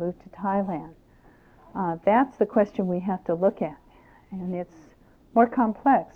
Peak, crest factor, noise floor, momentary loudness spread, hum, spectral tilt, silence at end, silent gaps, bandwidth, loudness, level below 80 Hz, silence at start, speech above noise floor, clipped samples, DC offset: -6 dBFS; 20 dB; -55 dBFS; 14 LU; none; -9.5 dB/octave; 0.1 s; none; 6.4 kHz; -25 LUFS; -58 dBFS; 0 s; 31 dB; under 0.1%; under 0.1%